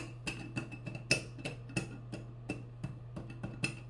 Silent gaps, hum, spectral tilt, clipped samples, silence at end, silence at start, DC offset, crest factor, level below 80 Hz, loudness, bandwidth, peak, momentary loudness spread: none; none; -4 dB/octave; under 0.1%; 0 s; 0 s; under 0.1%; 30 dB; -58 dBFS; -40 LUFS; 11.5 kHz; -12 dBFS; 13 LU